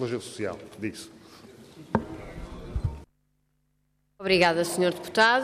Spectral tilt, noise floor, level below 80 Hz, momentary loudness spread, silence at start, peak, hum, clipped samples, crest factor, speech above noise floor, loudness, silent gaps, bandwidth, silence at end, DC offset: -4.5 dB/octave; -72 dBFS; -46 dBFS; 20 LU; 0 s; -8 dBFS; 50 Hz at -60 dBFS; under 0.1%; 20 dB; 46 dB; -27 LUFS; none; 15 kHz; 0 s; under 0.1%